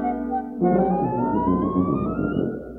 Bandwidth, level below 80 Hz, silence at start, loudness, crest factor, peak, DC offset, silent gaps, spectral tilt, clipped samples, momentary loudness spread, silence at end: 3.7 kHz; -42 dBFS; 0 s; -23 LUFS; 14 dB; -8 dBFS; under 0.1%; none; -11.5 dB/octave; under 0.1%; 6 LU; 0 s